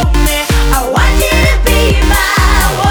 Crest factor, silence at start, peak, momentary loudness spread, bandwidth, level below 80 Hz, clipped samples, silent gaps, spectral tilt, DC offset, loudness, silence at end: 8 dB; 0 s; 0 dBFS; 2 LU; over 20 kHz; -12 dBFS; under 0.1%; none; -4 dB/octave; under 0.1%; -10 LUFS; 0 s